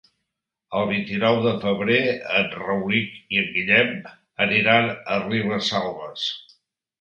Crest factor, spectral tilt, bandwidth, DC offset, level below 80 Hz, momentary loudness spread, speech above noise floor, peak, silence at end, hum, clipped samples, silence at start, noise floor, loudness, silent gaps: 22 dB; -5.5 dB/octave; 8.2 kHz; under 0.1%; -60 dBFS; 10 LU; 59 dB; -2 dBFS; 0.6 s; none; under 0.1%; 0.7 s; -81 dBFS; -21 LUFS; none